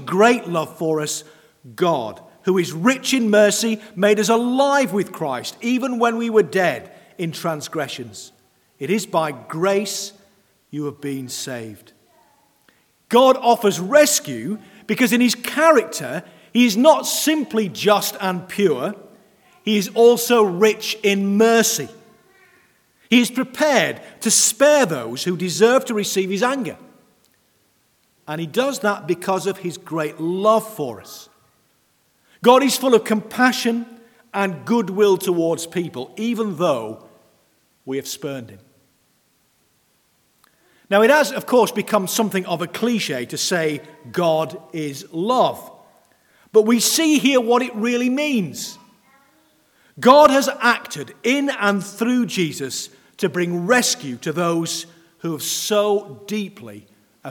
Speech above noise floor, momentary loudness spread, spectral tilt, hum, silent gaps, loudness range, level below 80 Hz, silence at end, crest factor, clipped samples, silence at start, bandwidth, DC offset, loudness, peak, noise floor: 44 dB; 15 LU; -3.5 dB/octave; none; none; 7 LU; -70 dBFS; 0 s; 20 dB; under 0.1%; 0 s; 19 kHz; under 0.1%; -19 LUFS; 0 dBFS; -62 dBFS